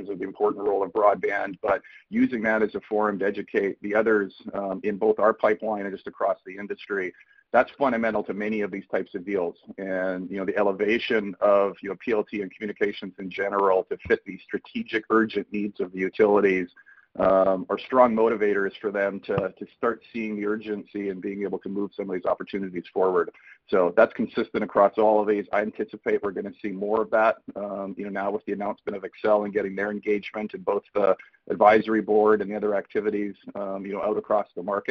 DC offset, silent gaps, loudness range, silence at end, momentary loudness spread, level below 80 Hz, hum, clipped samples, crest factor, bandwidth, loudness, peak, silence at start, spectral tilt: under 0.1%; none; 5 LU; 0 s; 12 LU; -62 dBFS; none; under 0.1%; 22 dB; 6.2 kHz; -25 LUFS; -4 dBFS; 0 s; -7.5 dB/octave